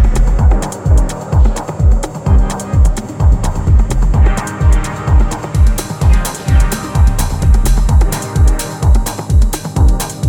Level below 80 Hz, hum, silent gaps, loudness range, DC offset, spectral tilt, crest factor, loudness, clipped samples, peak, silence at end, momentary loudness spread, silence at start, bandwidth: -12 dBFS; none; none; 1 LU; under 0.1%; -6 dB/octave; 10 dB; -14 LUFS; under 0.1%; 0 dBFS; 0 s; 3 LU; 0 s; 18 kHz